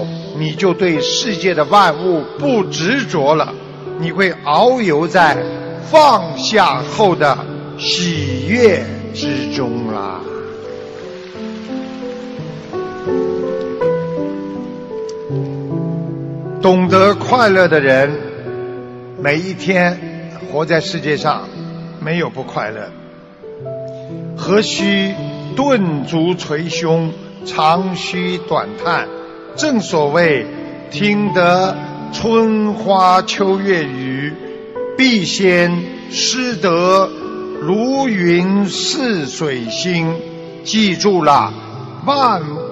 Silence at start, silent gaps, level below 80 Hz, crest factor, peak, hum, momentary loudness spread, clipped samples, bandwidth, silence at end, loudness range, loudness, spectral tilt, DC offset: 0 s; none; -54 dBFS; 16 dB; 0 dBFS; none; 16 LU; under 0.1%; 11.5 kHz; 0 s; 8 LU; -15 LUFS; -5 dB/octave; under 0.1%